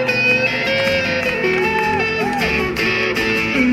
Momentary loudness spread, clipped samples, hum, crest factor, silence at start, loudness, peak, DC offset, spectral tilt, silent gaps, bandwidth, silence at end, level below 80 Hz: 3 LU; under 0.1%; none; 14 dB; 0 s; -16 LUFS; -4 dBFS; under 0.1%; -4.5 dB/octave; none; 16 kHz; 0 s; -40 dBFS